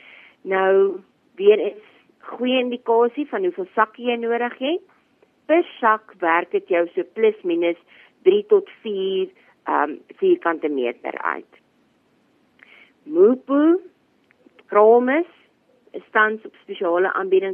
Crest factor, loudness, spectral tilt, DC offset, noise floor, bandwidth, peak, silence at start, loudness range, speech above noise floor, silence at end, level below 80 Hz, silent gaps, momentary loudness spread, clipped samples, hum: 18 dB; -20 LUFS; -8 dB/octave; under 0.1%; -62 dBFS; 3.6 kHz; -2 dBFS; 0.45 s; 4 LU; 42 dB; 0 s; -84 dBFS; none; 12 LU; under 0.1%; none